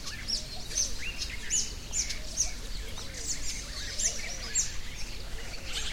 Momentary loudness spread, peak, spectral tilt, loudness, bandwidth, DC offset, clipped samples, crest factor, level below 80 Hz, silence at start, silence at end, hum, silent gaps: 11 LU; -16 dBFS; -0.5 dB/octave; -32 LUFS; 16.5 kHz; under 0.1%; under 0.1%; 18 dB; -42 dBFS; 0 s; 0 s; none; none